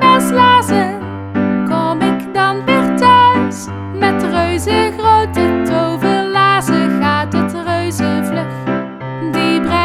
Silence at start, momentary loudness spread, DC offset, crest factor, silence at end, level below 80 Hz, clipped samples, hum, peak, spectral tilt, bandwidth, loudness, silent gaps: 0 s; 10 LU; under 0.1%; 12 dB; 0 s; -40 dBFS; under 0.1%; none; 0 dBFS; -5.5 dB/octave; 15 kHz; -13 LUFS; none